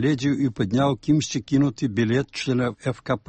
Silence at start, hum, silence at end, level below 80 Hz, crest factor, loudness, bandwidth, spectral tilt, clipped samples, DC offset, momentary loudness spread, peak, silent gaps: 0 s; none; 0.1 s; -52 dBFS; 14 dB; -23 LUFS; 8.8 kHz; -6 dB/octave; under 0.1%; under 0.1%; 4 LU; -8 dBFS; none